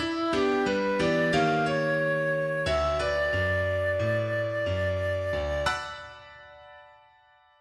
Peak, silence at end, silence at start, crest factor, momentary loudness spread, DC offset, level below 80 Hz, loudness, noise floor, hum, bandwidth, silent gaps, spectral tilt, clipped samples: -12 dBFS; 0.75 s; 0 s; 16 dB; 5 LU; under 0.1%; -46 dBFS; -27 LUFS; -60 dBFS; none; 12.5 kHz; none; -6 dB/octave; under 0.1%